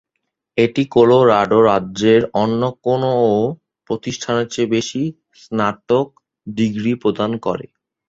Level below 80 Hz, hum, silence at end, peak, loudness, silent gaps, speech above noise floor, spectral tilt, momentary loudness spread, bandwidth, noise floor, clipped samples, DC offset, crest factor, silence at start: -54 dBFS; none; 0.45 s; 0 dBFS; -17 LUFS; none; 59 dB; -6 dB/octave; 13 LU; 7.8 kHz; -76 dBFS; under 0.1%; under 0.1%; 16 dB; 0.55 s